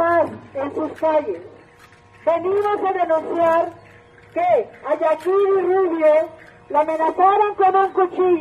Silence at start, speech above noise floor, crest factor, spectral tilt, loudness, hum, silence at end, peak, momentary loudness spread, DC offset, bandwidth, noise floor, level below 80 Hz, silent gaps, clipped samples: 0 s; 30 dB; 14 dB; -6.5 dB/octave; -19 LUFS; none; 0 s; -4 dBFS; 10 LU; under 0.1%; 10 kHz; -48 dBFS; -62 dBFS; none; under 0.1%